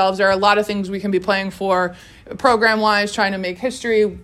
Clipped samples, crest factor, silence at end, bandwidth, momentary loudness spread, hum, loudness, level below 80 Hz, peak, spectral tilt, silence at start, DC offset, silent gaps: under 0.1%; 18 dB; 0 s; 13.5 kHz; 9 LU; none; -18 LUFS; -50 dBFS; 0 dBFS; -4.5 dB/octave; 0 s; under 0.1%; none